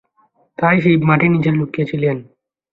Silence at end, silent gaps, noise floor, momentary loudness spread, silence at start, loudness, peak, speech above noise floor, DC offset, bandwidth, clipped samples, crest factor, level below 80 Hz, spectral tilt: 0.5 s; none; -59 dBFS; 8 LU; 0.6 s; -15 LUFS; -2 dBFS; 44 dB; under 0.1%; 4.7 kHz; under 0.1%; 16 dB; -52 dBFS; -10 dB/octave